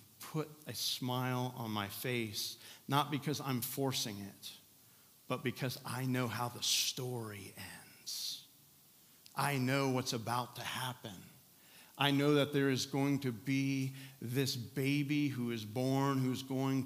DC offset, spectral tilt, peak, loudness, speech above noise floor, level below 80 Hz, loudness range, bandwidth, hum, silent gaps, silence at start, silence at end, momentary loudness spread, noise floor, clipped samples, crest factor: under 0.1%; -4.5 dB/octave; -14 dBFS; -36 LUFS; 27 dB; -82 dBFS; 4 LU; 16 kHz; none; none; 0 s; 0 s; 15 LU; -64 dBFS; under 0.1%; 22 dB